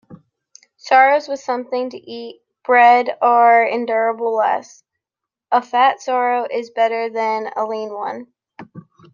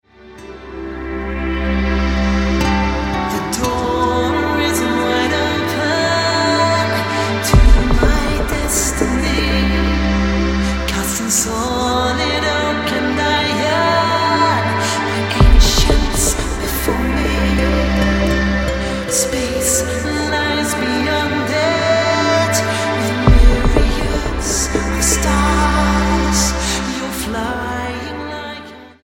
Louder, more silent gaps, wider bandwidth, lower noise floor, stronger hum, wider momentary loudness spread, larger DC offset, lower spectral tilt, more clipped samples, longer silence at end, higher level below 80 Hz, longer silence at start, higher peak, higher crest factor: about the same, -17 LUFS vs -16 LUFS; neither; second, 7.2 kHz vs 17 kHz; first, -85 dBFS vs -37 dBFS; neither; first, 16 LU vs 7 LU; neither; about the same, -3.5 dB/octave vs -4 dB/octave; neither; first, 0.35 s vs 0.15 s; second, -76 dBFS vs -20 dBFS; second, 0.1 s vs 0.25 s; about the same, -2 dBFS vs 0 dBFS; about the same, 16 dB vs 16 dB